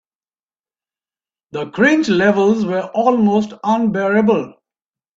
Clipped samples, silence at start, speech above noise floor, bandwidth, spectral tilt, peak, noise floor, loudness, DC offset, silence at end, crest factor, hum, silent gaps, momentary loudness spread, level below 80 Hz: under 0.1%; 1.55 s; over 75 dB; 7.6 kHz; -6.5 dB/octave; 0 dBFS; under -90 dBFS; -15 LUFS; under 0.1%; 0.65 s; 16 dB; none; none; 11 LU; -60 dBFS